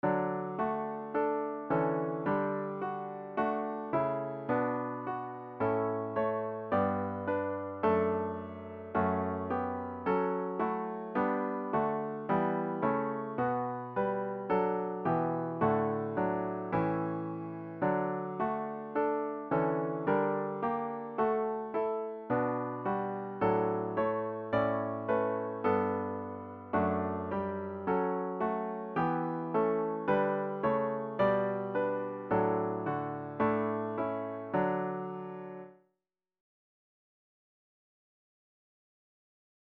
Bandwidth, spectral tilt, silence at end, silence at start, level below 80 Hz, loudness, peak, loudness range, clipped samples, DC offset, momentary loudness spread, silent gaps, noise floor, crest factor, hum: 5 kHz; -7 dB/octave; 3.95 s; 0.05 s; -68 dBFS; -33 LUFS; -16 dBFS; 2 LU; under 0.1%; under 0.1%; 7 LU; none; -87 dBFS; 18 dB; none